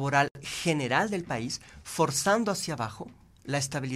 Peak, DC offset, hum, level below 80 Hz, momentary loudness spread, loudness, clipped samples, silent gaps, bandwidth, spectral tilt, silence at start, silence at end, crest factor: -8 dBFS; under 0.1%; none; -60 dBFS; 12 LU; -29 LUFS; under 0.1%; 0.31-0.35 s; 15.5 kHz; -4 dB/octave; 0 s; 0 s; 20 dB